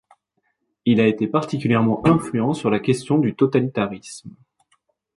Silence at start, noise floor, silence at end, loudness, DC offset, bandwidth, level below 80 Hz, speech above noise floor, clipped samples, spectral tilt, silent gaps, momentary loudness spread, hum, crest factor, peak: 0.85 s; -72 dBFS; 0.85 s; -20 LUFS; under 0.1%; 11.5 kHz; -54 dBFS; 52 dB; under 0.1%; -7 dB/octave; none; 9 LU; none; 18 dB; -2 dBFS